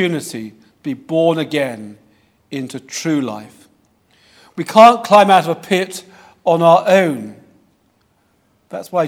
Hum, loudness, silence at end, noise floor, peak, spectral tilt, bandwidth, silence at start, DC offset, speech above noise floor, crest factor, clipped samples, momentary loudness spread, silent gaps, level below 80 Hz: none; -14 LUFS; 0 s; -59 dBFS; 0 dBFS; -5 dB/octave; 16.5 kHz; 0 s; under 0.1%; 45 dB; 16 dB; 0.2%; 23 LU; none; -62 dBFS